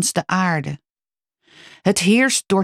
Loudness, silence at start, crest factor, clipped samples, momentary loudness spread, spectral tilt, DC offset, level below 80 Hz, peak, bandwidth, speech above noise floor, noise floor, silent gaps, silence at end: -18 LUFS; 0 s; 16 dB; under 0.1%; 13 LU; -4 dB/octave; under 0.1%; -60 dBFS; -4 dBFS; 15 kHz; over 72 dB; under -90 dBFS; none; 0 s